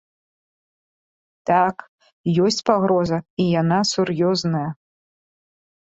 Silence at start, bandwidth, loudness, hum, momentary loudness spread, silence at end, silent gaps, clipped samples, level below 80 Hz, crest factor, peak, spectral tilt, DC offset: 1.45 s; 8 kHz; -20 LUFS; none; 10 LU; 1.2 s; 1.88-1.98 s, 2.13-2.24 s, 3.30-3.37 s; under 0.1%; -58 dBFS; 20 dB; -2 dBFS; -5.5 dB/octave; under 0.1%